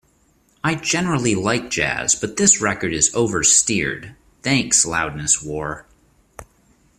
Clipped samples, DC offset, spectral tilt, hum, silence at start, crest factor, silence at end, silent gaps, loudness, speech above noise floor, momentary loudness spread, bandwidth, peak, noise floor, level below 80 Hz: under 0.1%; under 0.1%; -2.5 dB/octave; none; 0.65 s; 20 dB; 0.55 s; none; -18 LUFS; 40 dB; 13 LU; 15 kHz; 0 dBFS; -59 dBFS; -48 dBFS